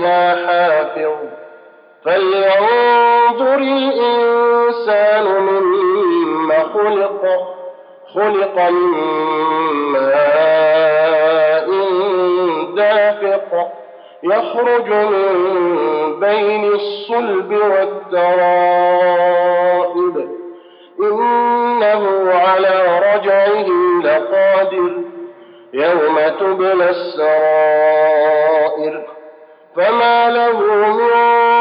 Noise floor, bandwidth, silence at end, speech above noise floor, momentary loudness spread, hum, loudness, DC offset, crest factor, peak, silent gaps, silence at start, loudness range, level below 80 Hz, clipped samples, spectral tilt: -42 dBFS; 5.2 kHz; 0 s; 29 dB; 7 LU; none; -14 LUFS; under 0.1%; 10 dB; -4 dBFS; none; 0 s; 3 LU; -90 dBFS; under 0.1%; -9.5 dB/octave